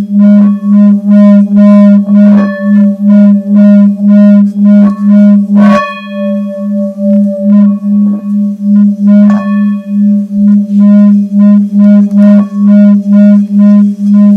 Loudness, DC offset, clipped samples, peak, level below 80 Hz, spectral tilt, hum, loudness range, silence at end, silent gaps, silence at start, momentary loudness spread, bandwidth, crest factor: -5 LUFS; under 0.1%; 10%; 0 dBFS; -56 dBFS; -10 dB/octave; none; 3 LU; 0 s; none; 0 s; 7 LU; 4.1 kHz; 4 dB